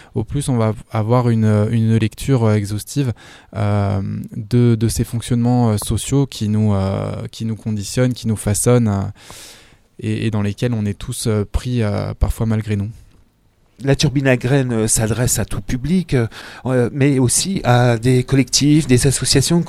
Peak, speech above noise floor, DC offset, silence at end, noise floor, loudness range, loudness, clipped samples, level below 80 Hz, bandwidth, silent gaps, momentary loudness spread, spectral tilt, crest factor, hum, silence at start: 0 dBFS; 39 dB; under 0.1%; 0 s; -56 dBFS; 5 LU; -17 LUFS; under 0.1%; -34 dBFS; 15.5 kHz; none; 9 LU; -5.5 dB/octave; 16 dB; none; 0.15 s